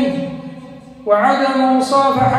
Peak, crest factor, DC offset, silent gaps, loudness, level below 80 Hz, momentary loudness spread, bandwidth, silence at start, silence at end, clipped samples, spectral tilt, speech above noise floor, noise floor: -2 dBFS; 14 dB; under 0.1%; none; -15 LUFS; -50 dBFS; 18 LU; 13.5 kHz; 0 s; 0 s; under 0.1%; -6 dB/octave; 22 dB; -36 dBFS